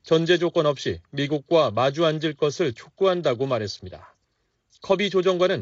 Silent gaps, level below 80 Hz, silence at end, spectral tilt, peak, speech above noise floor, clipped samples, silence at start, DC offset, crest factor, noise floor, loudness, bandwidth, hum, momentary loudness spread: none; -60 dBFS; 0 s; -4 dB/octave; -8 dBFS; 50 dB; under 0.1%; 0.05 s; under 0.1%; 16 dB; -72 dBFS; -23 LUFS; 7.8 kHz; none; 9 LU